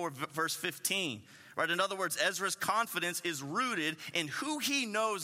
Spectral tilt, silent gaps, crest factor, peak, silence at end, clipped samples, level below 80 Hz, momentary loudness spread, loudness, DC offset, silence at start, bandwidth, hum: -2 dB/octave; none; 20 dB; -16 dBFS; 0 s; under 0.1%; -84 dBFS; 5 LU; -33 LUFS; under 0.1%; 0 s; 16 kHz; none